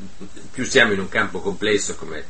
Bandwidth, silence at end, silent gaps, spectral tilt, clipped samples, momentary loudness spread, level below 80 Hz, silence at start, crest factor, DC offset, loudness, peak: 8.8 kHz; 0 s; none; -3 dB/octave; under 0.1%; 15 LU; -48 dBFS; 0 s; 22 dB; 4%; -20 LUFS; 0 dBFS